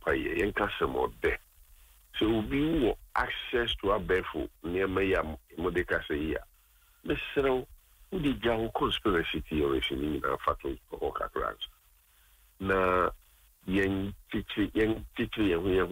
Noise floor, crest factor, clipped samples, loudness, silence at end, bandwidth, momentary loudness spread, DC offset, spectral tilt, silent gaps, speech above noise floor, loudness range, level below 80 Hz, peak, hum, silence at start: -63 dBFS; 16 dB; under 0.1%; -31 LUFS; 0 s; 16 kHz; 9 LU; under 0.1%; -6.5 dB/octave; none; 33 dB; 3 LU; -46 dBFS; -14 dBFS; none; 0 s